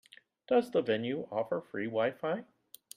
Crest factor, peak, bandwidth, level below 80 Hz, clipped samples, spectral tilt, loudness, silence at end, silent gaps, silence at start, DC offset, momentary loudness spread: 18 dB; -16 dBFS; 16 kHz; -78 dBFS; under 0.1%; -6 dB/octave; -33 LUFS; 0.5 s; none; 0.5 s; under 0.1%; 7 LU